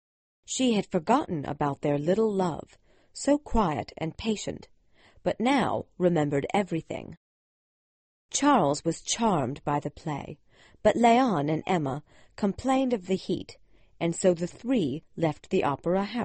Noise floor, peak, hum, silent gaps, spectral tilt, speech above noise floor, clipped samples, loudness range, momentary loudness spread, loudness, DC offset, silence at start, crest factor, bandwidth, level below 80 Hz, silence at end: -59 dBFS; -8 dBFS; none; 7.17-8.29 s; -5.5 dB/octave; 32 dB; under 0.1%; 3 LU; 11 LU; -27 LUFS; under 0.1%; 0.5 s; 20 dB; 8.8 kHz; -50 dBFS; 0 s